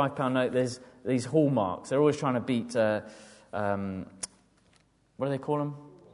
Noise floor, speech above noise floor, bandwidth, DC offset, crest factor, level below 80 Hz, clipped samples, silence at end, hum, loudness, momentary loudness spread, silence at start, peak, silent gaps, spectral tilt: -65 dBFS; 37 dB; 11 kHz; under 0.1%; 18 dB; -62 dBFS; under 0.1%; 0.2 s; none; -29 LUFS; 14 LU; 0 s; -12 dBFS; none; -6.5 dB/octave